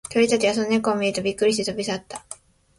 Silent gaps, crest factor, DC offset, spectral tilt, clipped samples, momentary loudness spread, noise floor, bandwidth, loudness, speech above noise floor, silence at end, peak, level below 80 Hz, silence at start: none; 16 dB; under 0.1%; -4 dB/octave; under 0.1%; 17 LU; -44 dBFS; 11.5 kHz; -22 LUFS; 23 dB; 0.45 s; -6 dBFS; -58 dBFS; 0.1 s